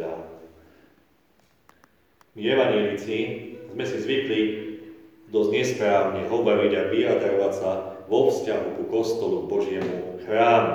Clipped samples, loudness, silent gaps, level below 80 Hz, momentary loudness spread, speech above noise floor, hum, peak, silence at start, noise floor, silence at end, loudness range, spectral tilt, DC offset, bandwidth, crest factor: under 0.1%; -24 LUFS; none; -66 dBFS; 12 LU; 40 dB; none; -6 dBFS; 0 s; -63 dBFS; 0 s; 5 LU; -5.5 dB/octave; under 0.1%; 14 kHz; 18 dB